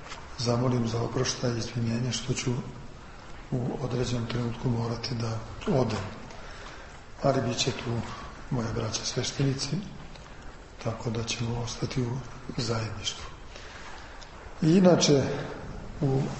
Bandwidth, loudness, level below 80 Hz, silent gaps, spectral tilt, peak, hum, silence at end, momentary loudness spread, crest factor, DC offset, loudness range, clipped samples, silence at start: 8.6 kHz; -29 LUFS; -48 dBFS; none; -5 dB/octave; -8 dBFS; none; 0 s; 19 LU; 22 dB; under 0.1%; 6 LU; under 0.1%; 0 s